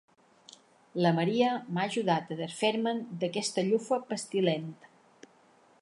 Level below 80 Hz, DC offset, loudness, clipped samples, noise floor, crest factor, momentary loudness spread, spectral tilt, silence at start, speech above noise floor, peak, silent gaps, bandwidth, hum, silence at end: -82 dBFS; under 0.1%; -30 LUFS; under 0.1%; -62 dBFS; 18 dB; 7 LU; -5 dB/octave; 0.95 s; 33 dB; -12 dBFS; none; 11.5 kHz; none; 1.1 s